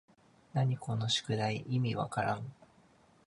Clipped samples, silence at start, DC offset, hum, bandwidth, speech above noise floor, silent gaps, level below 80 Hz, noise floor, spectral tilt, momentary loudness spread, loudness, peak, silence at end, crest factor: under 0.1%; 0.55 s; under 0.1%; none; 11 kHz; 31 dB; none; -68 dBFS; -64 dBFS; -5.5 dB/octave; 6 LU; -34 LUFS; -18 dBFS; 0.75 s; 16 dB